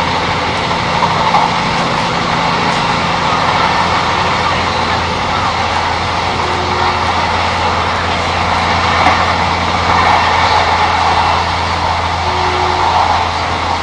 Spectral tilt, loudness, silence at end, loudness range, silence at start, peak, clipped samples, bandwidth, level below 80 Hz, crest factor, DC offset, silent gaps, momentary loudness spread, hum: -4 dB/octave; -13 LUFS; 0 s; 2 LU; 0 s; 0 dBFS; under 0.1%; 11 kHz; -34 dBFS; 12 dB; under 0.1%; none; 4 LU; none